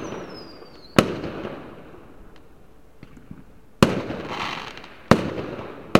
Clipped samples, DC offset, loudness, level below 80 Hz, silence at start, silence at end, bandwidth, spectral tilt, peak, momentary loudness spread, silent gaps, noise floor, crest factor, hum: under 0.1%; 0.4%; -24 LUFS; -48 dBFS; 0 s; 0 s; 16.5 kHz; -5.5 dB/octave; 0 dBFS; 24 LU; none; -51 dBFS; 26 dB; none